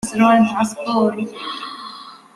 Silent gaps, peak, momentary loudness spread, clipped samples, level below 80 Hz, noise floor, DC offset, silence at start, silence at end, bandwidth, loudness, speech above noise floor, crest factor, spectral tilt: none; -2 dBFS; 19 LU; under 0.1%; -56 dBFS; -37 dBFS; under 0.1%; 0.05 s; 0.2 s; 13.5 kHz; -18 LUFS; 20 dB; 16 dB; -5 dB/octave